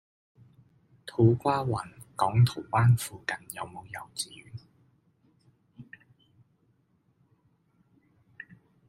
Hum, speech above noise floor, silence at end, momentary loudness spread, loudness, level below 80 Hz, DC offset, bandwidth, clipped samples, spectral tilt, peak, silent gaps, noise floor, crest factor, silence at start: none; 43 dB; 0.45 s; 25 LU; -28 LUFS; -62 dBFS; under 0.1%; 15.5 kHz; under 0.1%; -6.5 dB/octave; -10 dBFS; none; -69 dBFS; 22 dB; 1.05 s